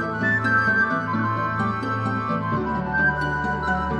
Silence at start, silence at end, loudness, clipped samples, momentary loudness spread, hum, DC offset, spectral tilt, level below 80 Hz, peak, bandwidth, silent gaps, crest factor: 0 s; 0 s; -22 LUFS; under 0.1%; 6 LU; none; under 0.1%; -7.5 dB/octave; -42 dBFS; -10 dBFS; 9.8 kHz; none; 14 dB